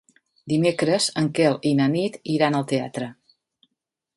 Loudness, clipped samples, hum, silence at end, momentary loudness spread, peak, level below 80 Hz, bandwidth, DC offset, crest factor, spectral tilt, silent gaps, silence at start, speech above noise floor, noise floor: -22 LUFS; under 0.1%; none; 1.05 s; 7 LU; -6 dBFS; -66 dBFS; 11.5 kHz; under 0.1%; 18 dB; -5.5 dB/octave; none; 0.45 s; 60 dB; -82 dBFS